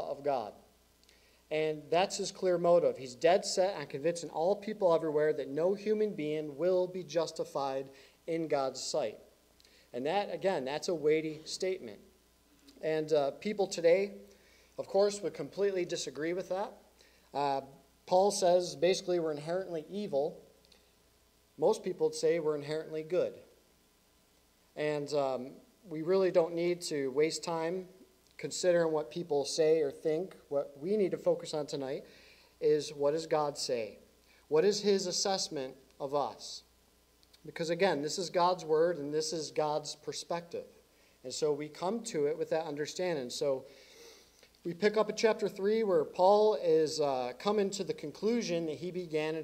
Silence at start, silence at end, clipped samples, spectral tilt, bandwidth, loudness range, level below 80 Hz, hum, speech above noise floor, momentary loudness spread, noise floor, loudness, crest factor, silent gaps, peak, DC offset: 0 s; 0 s; under 0.1%; -4 dB/octave; 15.5 kHz; 6 LU; -74 dBFS; none; 36 dB; 11 LU; -68 dBFS; -33 LUFS; 18 dB; none; -14 dBFS; under 0.1%